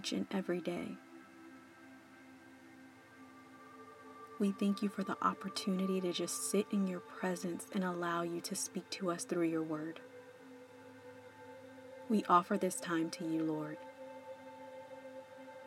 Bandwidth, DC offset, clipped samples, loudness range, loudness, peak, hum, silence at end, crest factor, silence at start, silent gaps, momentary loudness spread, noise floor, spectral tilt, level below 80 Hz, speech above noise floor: 16.5 kHz; under 0.1%; under 0.1%; 9 LU; -37 LUFS; -16 dBFS; none; 0 s; 24 dB; 0 s; none; 22 LU; -58 dBFS; -5 dB/octave; -90 dBFS; 21 dB